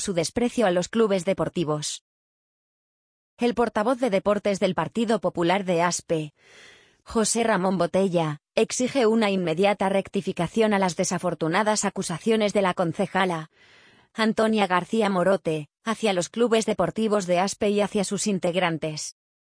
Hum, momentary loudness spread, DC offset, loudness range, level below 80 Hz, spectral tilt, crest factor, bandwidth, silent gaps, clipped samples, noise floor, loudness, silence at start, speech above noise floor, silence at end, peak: none; 6 LU; under 0.1%; 3 LU; -58 dBFS; -4.5 dB/octave; 18 dB; 10.5 kHz; 2.01-3.37 s; under 0.1%; under -90 dBFS; -24 LUFS; 0 s; over 66 dB; 0.3 s; -6 dBFS